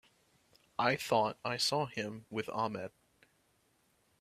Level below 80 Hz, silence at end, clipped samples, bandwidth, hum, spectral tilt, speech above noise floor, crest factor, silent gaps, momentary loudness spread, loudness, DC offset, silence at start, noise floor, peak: -74 dBFS; 1.35 s; under 0.1%; 15.5 kHz; none; -3.5 dB/octave; 39 dB; 24 dB; none; 12 LU; -35 LUFS; under 0.1%; 0.8 s; -73 dBFS; -14 dBFS